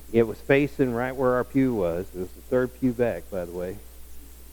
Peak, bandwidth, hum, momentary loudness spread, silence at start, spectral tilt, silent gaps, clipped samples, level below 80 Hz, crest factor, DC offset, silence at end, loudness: -6 dBFS; 20 kHz; none; 12 LU; 0 s; -7.5 dB/octave; none; under 0.1%; -46 dBFS; 20 dB; under 0.1%; 0 s; -26 LUFS